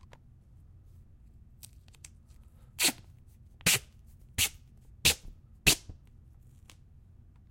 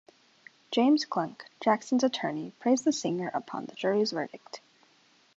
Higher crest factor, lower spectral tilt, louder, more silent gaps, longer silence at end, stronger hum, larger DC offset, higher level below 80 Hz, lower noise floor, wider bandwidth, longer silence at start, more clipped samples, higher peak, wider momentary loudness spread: first, 28 dB vs 20 dB; second, -1 dB/octave vs -4.5 dB/octave; about the same, -28 LUFS vs -29 LUFS; neither; first, 1.6 s vs 0.8 s; neither; neither; first, -52 dBFS vs -82 dBFS; second, -56 dBFS vs -64 dBFS; first, 16.5 kHz vs 8 kHz; first, 2.8 s vs 0.7 s; neither; about the same, -8 dBFS vs -10 dBFS; first, 27 LU vs 14 LU